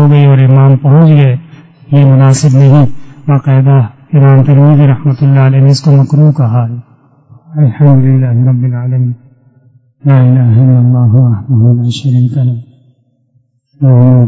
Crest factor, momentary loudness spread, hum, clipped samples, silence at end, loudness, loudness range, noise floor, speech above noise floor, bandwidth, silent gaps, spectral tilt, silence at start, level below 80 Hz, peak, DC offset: 6 dB; 8 LU; none; 2%; 0 s; -7 LUFS; 4 LU; -53 dBFS; 48 dB; 8 kHz; none; -8.5 dB/octave; 0 s; -44 dBFS; 0 dBFS; under 0.1%